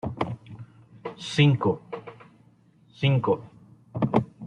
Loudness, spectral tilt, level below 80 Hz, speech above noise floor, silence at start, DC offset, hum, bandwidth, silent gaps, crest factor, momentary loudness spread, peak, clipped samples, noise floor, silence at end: -25 LUFS; -7 dB/octave; -60 dBFS; 36 dB; 0.05 s; under 0.1%; none; 9.6 kHz; none; 22 dB; 20 LU; -6 dBFS; under 0.1%; -58 dBFS; 0 s